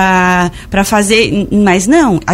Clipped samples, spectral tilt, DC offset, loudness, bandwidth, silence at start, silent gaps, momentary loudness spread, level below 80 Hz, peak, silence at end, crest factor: 0.1%; -4.5 dB/octave; under 0.1%; -10 LUFS; 16 kHz; 0 s; none; 5 LU; -32 dBFS; 0 dBFS; 0 s; 10 dB